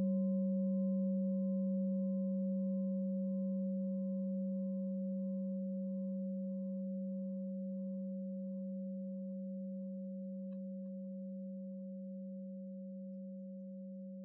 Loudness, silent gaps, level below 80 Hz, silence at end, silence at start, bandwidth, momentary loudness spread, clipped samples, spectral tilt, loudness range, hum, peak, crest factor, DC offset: -40 LUFS; none; under -90 dBFS; 0 s; 0 s; 1.1 kHz; 12 LU; under 0.1%; -14.5 dB/octave; 9 LU; none; -28 dBFS; 10 dB; under 0.1%